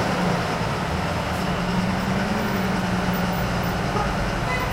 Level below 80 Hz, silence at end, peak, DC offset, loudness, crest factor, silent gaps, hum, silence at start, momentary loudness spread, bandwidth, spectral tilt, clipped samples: -36 dBFS; 0 s; -10 dBFS; under 0.1%; -24 LUFS; 14 dB; none; none; 0 s; 2 LU; 16 kHz; -5.5 dB/octave; under 0.1%